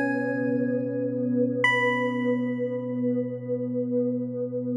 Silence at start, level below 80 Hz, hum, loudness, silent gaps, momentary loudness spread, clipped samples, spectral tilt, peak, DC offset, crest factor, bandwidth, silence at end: 0 s; -90 dBFS; none; -26 LUFS; none; 8 LU; under 0.1%; -7 dB/octave; -10 dBFS; under 0.1%; 16 dB; 9.6 kHz; 0 s